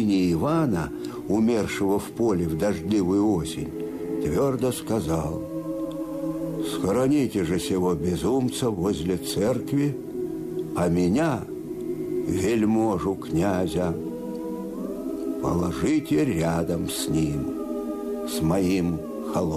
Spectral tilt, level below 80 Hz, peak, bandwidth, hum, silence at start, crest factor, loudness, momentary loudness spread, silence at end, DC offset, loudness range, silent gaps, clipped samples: -6.5 dB/octave; -46 dBFS; -14 dBFS; 15 kHz; none; 0 s; 12 dB; -25 LUFS; 9 LU; 0 s; under 0.1%; 2 LU; none; under 0.1%